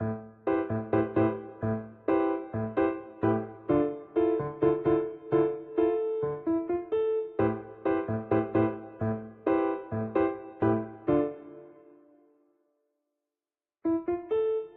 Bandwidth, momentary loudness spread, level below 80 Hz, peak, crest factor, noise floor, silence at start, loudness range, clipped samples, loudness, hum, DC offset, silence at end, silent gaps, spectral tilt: 4 kHz; 6 LU; -60 dBFS; -12 dBFS; 18 dB; under -90 dBFS; 0 s; 6 LU; under 0.1%; -29 LUFS; none; under 0.1%; 0.05 s; none; -8 dB/octave